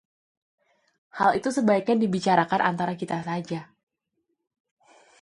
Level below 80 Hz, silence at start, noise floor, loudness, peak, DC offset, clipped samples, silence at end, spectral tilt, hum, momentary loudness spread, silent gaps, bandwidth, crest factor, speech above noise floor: -68 dBFS; 1.15 s; -78 dBFS; -24 LUFS; -4 dBFS; under 0.1%; under 0.1%; 1.6 s; -6 dB/octave; none; 11 LU; none; 11.5 kHz; 22 dB; 54 dB